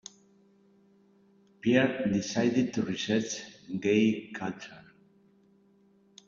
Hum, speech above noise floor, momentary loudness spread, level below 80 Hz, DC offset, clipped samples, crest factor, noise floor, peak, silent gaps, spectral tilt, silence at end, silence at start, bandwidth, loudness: none; 35 dB; 14 LU; -68 dBFS; under 0.1%; under 0.1%; 20 dB; -64 dBFS; -10 dBFS; none; -5 dB/octave; 1.5 s; 1.65 s; 7.6 kHz; -29 LUFS